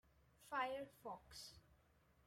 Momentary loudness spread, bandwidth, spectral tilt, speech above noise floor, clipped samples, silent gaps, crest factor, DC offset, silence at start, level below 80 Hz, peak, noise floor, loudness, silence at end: 20 LU; 16 kHz; -3 dB/octave; 26 dB; under 0.1%; none; 20 dB; under 0.1%; 0.4 s; -76 dBFS; -32 dBFS; -75 dBFS; -50 LUFS; 0.5 s